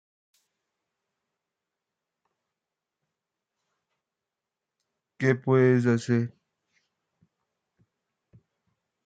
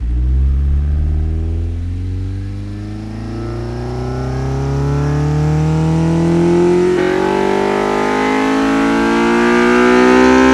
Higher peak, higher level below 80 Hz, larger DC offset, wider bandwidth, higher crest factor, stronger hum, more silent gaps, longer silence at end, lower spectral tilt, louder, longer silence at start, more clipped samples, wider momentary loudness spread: second, -10 dBFS vs 0 dBFS; second, -76 dBFS vs -22 dBFS; neither; second, 9 kHz vs 12 kHz; first, 22 dB vs 14 dB; neither; neither; first, 2.8 s vs 0 s; about the same, -8 dB/octave vs -7 dB/octave; second, -24 LUFS vs -14 LUFS; first, 5.2 s vs 0 s; neither; second, 7 LU vs 13 LU